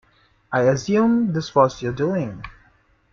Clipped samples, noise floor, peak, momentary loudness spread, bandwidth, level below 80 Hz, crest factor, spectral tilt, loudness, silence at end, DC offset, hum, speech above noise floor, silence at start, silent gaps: under 0.1%; -58 dBFS; -2 dBFS; 12 LU; 7.4 kHz; -52 dBFS; 20 dB; -6.5 dB/octave; -20 LUFS; 0.6 s; under 0.1%; none; 39 dB; 0.5 s; none